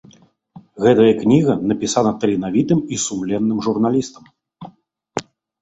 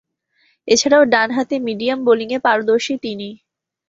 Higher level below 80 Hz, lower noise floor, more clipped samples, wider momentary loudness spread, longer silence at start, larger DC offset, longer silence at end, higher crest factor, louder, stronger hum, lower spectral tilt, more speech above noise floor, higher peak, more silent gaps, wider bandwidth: first, -54 dBFS vs -62 dBFS; second, -50 dBFS vs -62 dBFS; neither; about the same, 16 LU vs 15 LU; about the same, 0.55 s vs 0.65 s; neither; second, 0.4 s vs 0.55 s; about the same, 16 dB vs 16 dB; about the same, -17 LUFS vs -16 LUFS; neither; first, -5.5 dB/octave vs -3 dB/octave; second, 34 dB vs 45 dB; about the same, -2 dBFS vs -2 dBFS; neither; about the same, 8.2 kHz vs 8 kHz